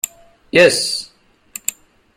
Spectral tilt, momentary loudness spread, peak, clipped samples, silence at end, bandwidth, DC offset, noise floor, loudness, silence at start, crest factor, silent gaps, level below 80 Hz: -2 dB/octave; 20 LU; 0 dBFS; under 0.1%; 0.45 s; 16.5 kHz; under 0.1%; -38 dBFS; -16 LUFS; 0.05 s; 18 dB; none; -56 dBFS